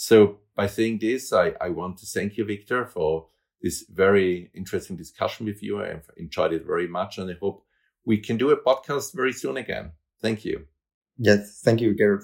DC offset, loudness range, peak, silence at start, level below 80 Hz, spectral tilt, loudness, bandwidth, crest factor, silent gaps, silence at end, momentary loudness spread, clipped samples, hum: under 0.1%; 4 LU; -4 dBFS; 0 s; -58 dBFS; -5.5 dB/octave; -25 LUFS; 16.5 kHz; 20 dB; 10.94-11.01 s; 0 s; 12 LU; under 0.1%; none